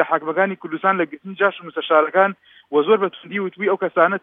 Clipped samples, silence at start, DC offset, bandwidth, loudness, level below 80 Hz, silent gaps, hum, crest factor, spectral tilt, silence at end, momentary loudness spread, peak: under 0.1%; 0 s; under 0.1%; 3.9 kHz; -20 LUFS; -82 dBFS; none; none; 18 dB; -8.5 dB/octave; 0.05 s; 9 LU; 0 dBFS